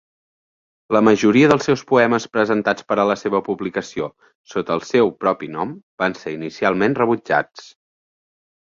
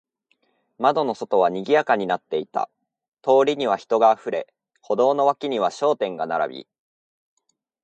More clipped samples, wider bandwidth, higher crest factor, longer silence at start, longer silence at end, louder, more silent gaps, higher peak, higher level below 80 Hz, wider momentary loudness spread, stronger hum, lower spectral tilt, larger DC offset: neither; second, 7.6 kHz vs 8.8 kHz; about the same, 18 dB vs 18 dB; about the same, 0.9 s vs 0.8 s; second, 1.05 s vs 1.2 s; first, -19 LUFS vs -22 LUFS; first, 4.35-4.44 s, 5.83-5.98 s vs 3.08-3.12 s; about the same, -2 dBFS vs -4 dBFS; first, -58 dBFS vs -74 dBFS; first, 14 LU vs 11 LU; neither; about the same, -6 dB/octave vs -5 dB/octave; neither